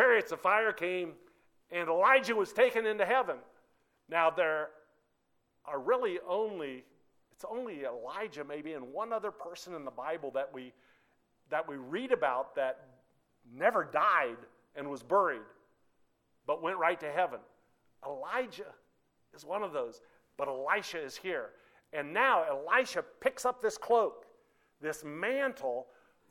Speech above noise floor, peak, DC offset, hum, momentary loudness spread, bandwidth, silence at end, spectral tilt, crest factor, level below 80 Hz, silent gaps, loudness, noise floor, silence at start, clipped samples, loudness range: 44 dB; -12 dBFS; under 0.1%; none; 15 LU; 16.5 kHz; 0.45 s; -3.5 dB/octave; 22 dB; -78 dBFS; none; -33 LUFS; -77 dBFS; 0 s; under 0.1%; 10 LU